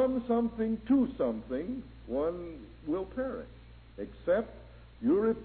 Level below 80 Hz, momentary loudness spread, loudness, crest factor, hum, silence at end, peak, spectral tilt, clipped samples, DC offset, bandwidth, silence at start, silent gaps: -52 dBFS; 16 LU; -32 LUFS; 14 dB; none; 0 s; -16 dBFS; -11 dB/octave; under 0.1%; under 0.1%; 4.5 kHz; 0 s; none